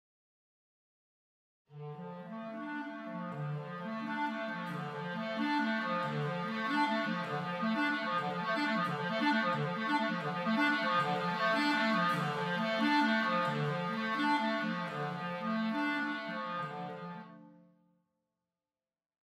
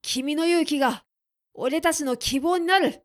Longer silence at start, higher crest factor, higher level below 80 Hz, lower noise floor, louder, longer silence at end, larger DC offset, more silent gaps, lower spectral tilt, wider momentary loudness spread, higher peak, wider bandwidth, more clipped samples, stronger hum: first, 1.7 s vs 0.05 s; about the same, 16 dB vs 18 dB; second, -86 dBFS vs -52 dBFS; first, under -90 dBFS vs -63 dBFS; second, -34 LUFS vs -23 LUFS; first, 1.75 s vs 0.1 s; neither; neither; first, -6 dB/octave vs -2.5 dB/octave; first, 12 LU vs 6 LU; second, -18 dBFS vs -6 dBFS; second, 14 kHz vs 15.5 kHz; neither; neither